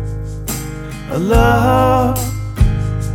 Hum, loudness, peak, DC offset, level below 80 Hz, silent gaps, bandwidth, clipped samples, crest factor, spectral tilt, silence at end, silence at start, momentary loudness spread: none; -16 LUFS; 0 dBFS; under 0.1%; -22 dBFS; none; over 20 kHz; under 0.1%; 14 dB; -6 dB/octave; 0 s; 0 s; 13 LU